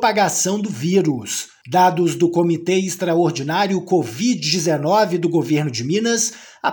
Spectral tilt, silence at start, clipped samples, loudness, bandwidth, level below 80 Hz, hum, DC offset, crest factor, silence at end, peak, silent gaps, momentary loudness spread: -4.5 dB/octave; 0 s; under 0.1%; -18 LUFS; 19 kHz; -66 dBFS; none; under 0.1%; 16 dB; 0 s; -2 dBFS; none; 5 LU